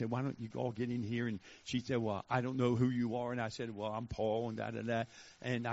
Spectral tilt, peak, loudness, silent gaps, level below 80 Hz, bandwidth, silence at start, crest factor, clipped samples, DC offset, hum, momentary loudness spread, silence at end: -6 dB/octave; -18 dBFS; -38 LUFS; none; -64 dBFS; 7.6 kHz; 0 s; 20 dB; under 0.1%; under 0.1%; none; 7 LU; 0 s